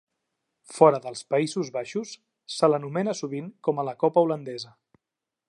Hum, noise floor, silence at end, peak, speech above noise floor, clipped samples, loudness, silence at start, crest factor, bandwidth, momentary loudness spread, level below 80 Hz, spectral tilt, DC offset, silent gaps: none; -87 dBFS; 0.85 s; -2 dBFS; 63 dB; under 0.1%; -25 LUFS; 0.7 s; 24 dB; 11.5 kHz; 18 LU; -80 dBFS; -5.5 dB/octave; under 0.1%; none